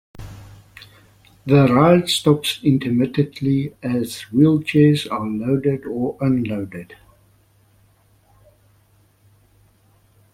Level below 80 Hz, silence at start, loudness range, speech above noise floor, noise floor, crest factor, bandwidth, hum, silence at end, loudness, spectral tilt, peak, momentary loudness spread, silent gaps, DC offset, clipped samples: -52 dBFS; 0.2 s; 10 LU; 39 dB; -57 dBFS; 20 dB; 16 kHz; none; 3.4 s; -18 LUFS; -6.5 dB/octave; 0 dBFS; 14 LU; none; under 0.1%; under 0.1%